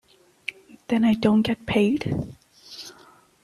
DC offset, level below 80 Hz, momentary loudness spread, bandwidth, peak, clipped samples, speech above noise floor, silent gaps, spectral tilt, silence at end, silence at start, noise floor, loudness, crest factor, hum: under 0.1%; -52 dBFS; 19 LU; 13 kHz; -6 dBFS; under 0.1%; 32 dB; none; -6.5 dB/octave; 0.55 s; 0.5 s; -53 dBFS; -22 LUFS; 20 dB; none